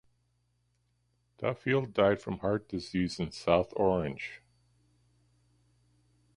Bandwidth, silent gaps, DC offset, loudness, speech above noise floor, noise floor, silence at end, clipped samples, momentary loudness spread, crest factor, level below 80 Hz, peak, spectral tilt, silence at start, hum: 11.5 kHz; none; under 0.1%; -31 LUFS; 44 dB; -74 dBFS; 2 s; under 0.1%; 10 LU; 24 dB; -56 dBFS; -10 dBFS; -6.5 dB/octave; 1.4 s; 60 Hz at -60 dBFS